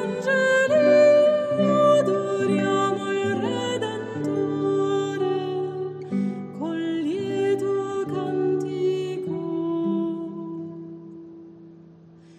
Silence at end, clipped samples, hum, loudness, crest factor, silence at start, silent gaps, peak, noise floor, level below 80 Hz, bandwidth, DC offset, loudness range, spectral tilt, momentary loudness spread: 0.65 s; under 0.1%; none; -23 LUFS; 16 dB; 0 s; none; -6 dBFS; -49 dBFS; -72 dBFS; 10 kHz; under 0.1%; 8 LU; -6 dB/octave; 14 LU